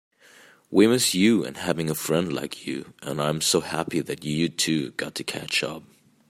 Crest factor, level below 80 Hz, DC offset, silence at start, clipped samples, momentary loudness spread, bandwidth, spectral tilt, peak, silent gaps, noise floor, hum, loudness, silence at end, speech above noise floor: 20 dB; -62 dBFS; under 0.1%; 0.7 s; under 0.1%; 13 LU; 16 kHz; -4 dB/octave; -4 dBFS; none; -53 dBFS; none; -24 LUFS; 0.5 s; 29 dB